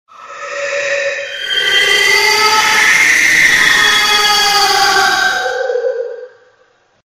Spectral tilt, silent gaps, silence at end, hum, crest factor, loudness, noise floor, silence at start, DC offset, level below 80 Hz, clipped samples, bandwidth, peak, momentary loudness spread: 0.5 dB/octave; none; 0.8 s; none; 12 dB; -9 LUFS; -53 dBFS; 0.2 s; under 0.1%; -46 dBFS; under 0.1%; 16.5 kHz; 0 dBFS; 12 LU